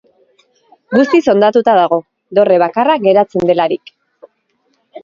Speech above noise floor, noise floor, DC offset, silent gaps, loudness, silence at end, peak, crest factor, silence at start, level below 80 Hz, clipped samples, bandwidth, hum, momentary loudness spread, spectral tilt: 51 dB; -62 dBFS; under 0.1%; none; -12 LUFS; 0.05 s; 0 dBFS; 14 dB; 0.9 s; -58 dBFS; under 0.1%; 7.4 kHz; none; 7 LU; -6.5 dB/octave